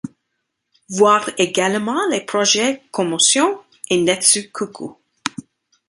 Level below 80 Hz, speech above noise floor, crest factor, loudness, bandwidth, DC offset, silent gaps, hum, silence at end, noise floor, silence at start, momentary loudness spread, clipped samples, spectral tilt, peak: -64 dBFS; 57 dB; 18 dB; -17 LUFS; 11.5 kHz; under 0.1%; none; none; 0.45 s; -75 dBFS; 0.05 s; 15 LU; under 0.1%; -2 dB/octave; 0 dBFS